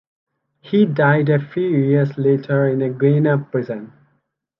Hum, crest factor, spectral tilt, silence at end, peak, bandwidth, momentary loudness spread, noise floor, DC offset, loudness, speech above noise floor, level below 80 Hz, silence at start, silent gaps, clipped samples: none; 16 dB; -11 dB/octave; 0.75 s; -2 dBFS; 5.4 kHz; 8 LU; -67 dBFS; under 0.1%; -17 LUFS; 51 dB; -64 dBFS; 0.65 s; none; under 0.1%